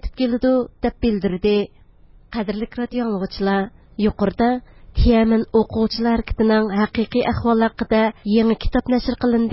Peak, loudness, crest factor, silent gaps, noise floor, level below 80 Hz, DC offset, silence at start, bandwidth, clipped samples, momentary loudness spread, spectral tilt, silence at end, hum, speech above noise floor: -4 dBFS; -20 LUFS; 16 dB; none; -48 dBFS; -32 dBFS; under 0.1%; 0.05 s; 5.8 kHz; under 0.1%; 8 LU; -11 dB/octave; 0 s; none; 29 dB